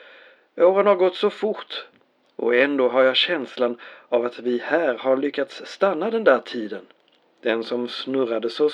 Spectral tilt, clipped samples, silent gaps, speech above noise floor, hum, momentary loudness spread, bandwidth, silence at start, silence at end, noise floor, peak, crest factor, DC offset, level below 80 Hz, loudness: -5 dB/octave; under 0.1%; none; 29 dB; none; 13 LU; 9 kHz; 0.55 s; 0 s; -50 dBFS; -4 dBFS; 18 dB; under 0.1%; under -90 dBFS; -22 LUFS